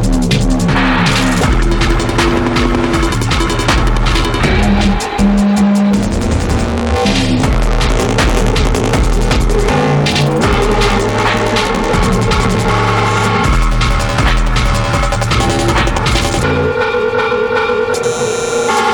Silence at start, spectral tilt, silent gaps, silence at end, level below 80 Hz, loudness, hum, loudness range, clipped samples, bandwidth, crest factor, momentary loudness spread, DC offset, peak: 0 s; -5 dB/octave; none; 0 s; -18 dBFS; -13 LUFS; none; 1 LU; under 0.1%; 18.5 kHz; 12 dB; 3 LU; under 0.1%; 0 dBFS